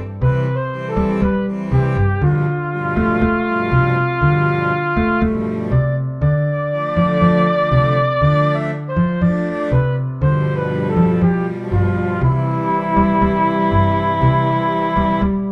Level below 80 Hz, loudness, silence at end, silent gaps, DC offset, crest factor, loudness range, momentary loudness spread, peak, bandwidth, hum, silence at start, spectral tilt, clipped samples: -32 dBFS; -17 LUFS; 0 s; none; under 0.1%; 16 dB; 1 LU; 5 LU; 0 dBFS; 5.6 kHz; none; 0 s; -9.5 dB/octave; under 0.1%